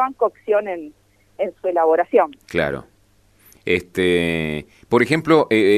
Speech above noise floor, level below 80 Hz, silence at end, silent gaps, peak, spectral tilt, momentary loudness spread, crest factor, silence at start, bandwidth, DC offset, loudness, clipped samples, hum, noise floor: 38 dB; -50 dBFS; 0 s; none; -4 dBFS; -6 dB/octave; 14 LU; 16 dB; 0 s; 13.5 kHz; under 0.1%; -19 LUFS; under 0.1%; 50 Hz at -60 dBFS; -56 dBFS